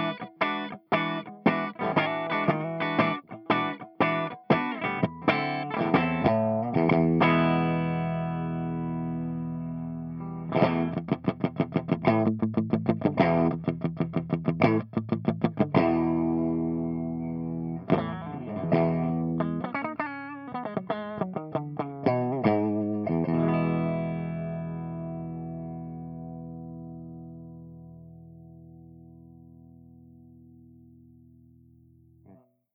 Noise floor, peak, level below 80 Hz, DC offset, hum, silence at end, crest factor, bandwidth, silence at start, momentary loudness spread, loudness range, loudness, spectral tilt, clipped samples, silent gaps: -57 dBFS; -8 dBFS; -60 dBFS; under 0.1%; none; 0.4 s; 22 dB; 5.6 kHz; 0 s; 13 LU; 13 LU; -28 LUFS; -10 dB/octave; under 0.1%; none